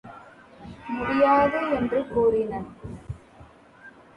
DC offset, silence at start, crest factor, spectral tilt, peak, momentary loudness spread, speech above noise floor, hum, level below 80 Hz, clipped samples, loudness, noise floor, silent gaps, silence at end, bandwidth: under 0.1%; 0.05 s; 18 dB; -7.5 dB/octave; -8 dBFS; 22 LU; 28 dB; none; -50 dBFS; under 0.1%; -23 LUFS; -50 dBFS; none; 0.3 s; 10 kHz